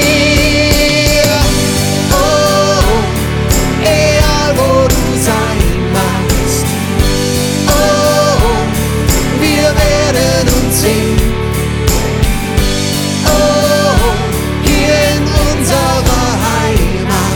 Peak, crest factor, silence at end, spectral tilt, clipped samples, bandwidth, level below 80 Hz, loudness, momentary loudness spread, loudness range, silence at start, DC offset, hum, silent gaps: 0 dBFS; 10 dB; 0 s; -4.5 dB/octave; under 0.1%; over 20 kHz; -18 dBFS; -11 LUFS; 4 LU; 2 LU; 0 s; 1%; none; none